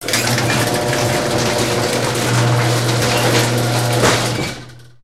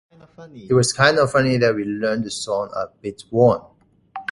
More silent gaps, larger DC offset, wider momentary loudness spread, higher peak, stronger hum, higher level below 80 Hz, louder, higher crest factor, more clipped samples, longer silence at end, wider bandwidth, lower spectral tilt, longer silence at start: neither; first, 0.5% vs under 0.1%; second, 3 LU vs 14 LU; about the same, 0 dBFS vs 0 dBFS; neither; first, -42 dBFS vs -52 dBFS; first, -16 LUFS vs -19 LUFS; about the same, 16 dB vs 20 dB; neither; about the same, 0.2 s vs 0.1 s; first, 16 kHz vs 11.5 kHz; about the same, -4 dB/octave vs -5 dB/octave; second, 0 s vs 0.4 s